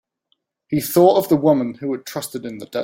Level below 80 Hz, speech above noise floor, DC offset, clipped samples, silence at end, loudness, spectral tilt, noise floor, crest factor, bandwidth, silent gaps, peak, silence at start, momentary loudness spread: -60 dBFS; 51 dB; under 0.1%; under 0.1%; 0 s; -18 LUFS; -6 dB/octave; -69 dBFS; 18 dB; 17 kHz; none; -2 dBFS; 0.7 s; 14 LU